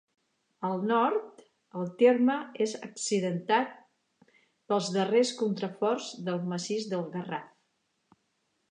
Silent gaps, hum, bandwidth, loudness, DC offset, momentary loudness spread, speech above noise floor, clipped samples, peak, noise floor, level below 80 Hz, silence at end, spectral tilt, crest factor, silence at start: none; none; 10.5 kHz; -29 LUFS; under 0.1%; 12 LU; 48 dB; under 0.1%; -10 dBFS; -77 dBFS; -84 dBFS; 1.25 s; -5 dB/octave; 20 dB; 0.6 s